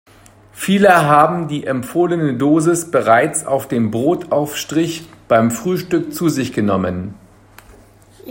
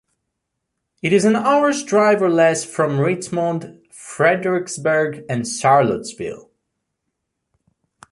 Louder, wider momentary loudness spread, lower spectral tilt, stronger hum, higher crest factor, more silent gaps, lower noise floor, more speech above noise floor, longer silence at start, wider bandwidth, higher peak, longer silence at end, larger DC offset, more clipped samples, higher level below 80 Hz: about the same, -16 LUFS vs -18 LUFS; second, 10 LU vs 14 LU; about the same, -5.5 dB/octave vs -5 dB/octave; neither; about the same, 16 dB vs 18 dB; neither; second, -45 dBFS vs -77 dBFS; second, 30 dB vs 60 dB; second, 0.55 s vs 1.05 s; first, 16.5 kHz vs 11.5 kHz; about the same, 0 dBFS vs -2 dBFS; second, 0 s vs 1.7 s; neither; neither; first, -54 dBFS vs -60 dBFS